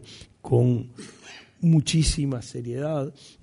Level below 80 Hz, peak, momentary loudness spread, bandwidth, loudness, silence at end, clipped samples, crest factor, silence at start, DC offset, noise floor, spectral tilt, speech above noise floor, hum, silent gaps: -38 dBFS; -10 dBFS; 22 LU; 11 kHz; -24 LUFS; 0.3 s; under 0.1%; 16 dB; 0 s; under 0.1%; -47 dBFS; -6 dB/octave; 24 dB; none; none